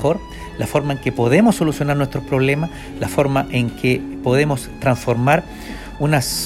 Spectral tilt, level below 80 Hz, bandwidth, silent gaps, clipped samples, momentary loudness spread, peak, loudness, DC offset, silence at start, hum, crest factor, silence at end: -6 dB/octave; -38 dBFS; 15.5 kHz; none; under 0.1%; 11 LU; 0 dBFS; -18 LUFS; under 0.1%; 0 s; none; 18 dB; 0 s